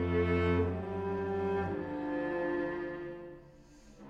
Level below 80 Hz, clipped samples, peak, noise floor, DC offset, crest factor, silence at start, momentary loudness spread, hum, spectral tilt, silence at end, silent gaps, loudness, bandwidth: -52 dBFS; under 0.1%; -18 dBFS; -56 dBFS; under 0.1%; 16 dB; 0 s; 14 LU; none; -8.5 dB/octave; 0 s; none; -34 LUFS; 7.2 kHz